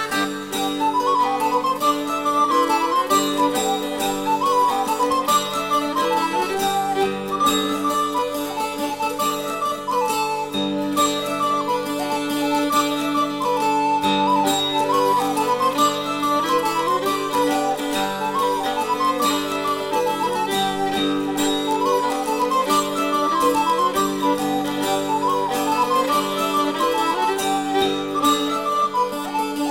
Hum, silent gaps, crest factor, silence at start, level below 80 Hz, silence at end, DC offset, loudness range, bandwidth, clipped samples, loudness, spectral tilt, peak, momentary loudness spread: none; none; 14 dB; 0 s; -56 dBFS; 0 s; 0.2%; 3 LU; 16.5 kHz; under 0.1%; -20 LUFS; -3 dB/octave; -6 dBFS; 5 LU